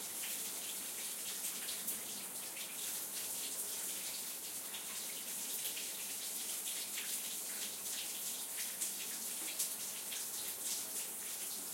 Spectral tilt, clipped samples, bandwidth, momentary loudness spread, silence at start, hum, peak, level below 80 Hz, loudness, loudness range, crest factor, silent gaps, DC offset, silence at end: 1 dB/octave; under 0.1%; 16.5 kHz; 3 LU; 0 s; none; -22 dBFS; under -90 dBFS; -39 LUFS; 1 LU; 20 dB; none; under 0.1%; 0 s